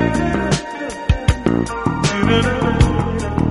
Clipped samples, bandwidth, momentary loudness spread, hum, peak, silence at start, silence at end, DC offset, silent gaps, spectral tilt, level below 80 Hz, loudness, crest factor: under 0.1%; 11.5 kHz; 5 LU; none; 0 dBFS; 0 s; 0 s; under 0.1%; none; -6 dB/octave; -24 dBFS; -18 LUFS; 16 dB